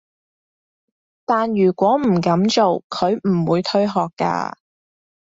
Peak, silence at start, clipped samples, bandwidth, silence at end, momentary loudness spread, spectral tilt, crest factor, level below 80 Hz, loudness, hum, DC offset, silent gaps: -4 dBFS; 1.3 s; under 0.1%; 7.8 kHz; 0.75 s; 6 LU; -6.5 dB/octave; 16 dB; -60 dBFS; -18 LUFS; none; under 0.1%; 2.84-2.90 s